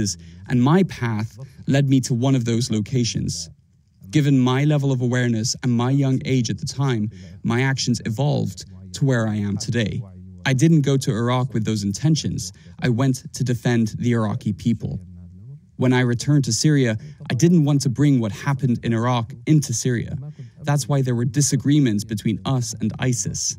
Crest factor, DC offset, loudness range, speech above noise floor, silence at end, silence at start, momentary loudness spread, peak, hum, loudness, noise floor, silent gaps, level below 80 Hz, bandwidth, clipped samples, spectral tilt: 16 dB; under 0.1%; 3 LU; 30 dB; 0 s; 0 s; 11 LU; -4 dBFS; none; -21 LUFS; -50 dBFS; none; -52 dBFS; 15.5 kHz; under 0.1%; -5.5 dB/octave